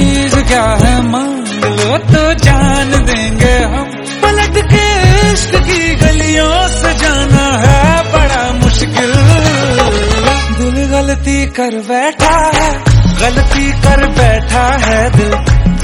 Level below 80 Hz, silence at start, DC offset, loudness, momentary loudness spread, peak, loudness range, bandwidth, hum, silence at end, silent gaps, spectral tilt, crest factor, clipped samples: -14 dBFS; 0 s; under 0.1%; -10 LUFS; 5 LU; 0 dBFS; 2 LU; 12 kHz; none; 0 s; none; -5 dB/octave; 8 dB; 2%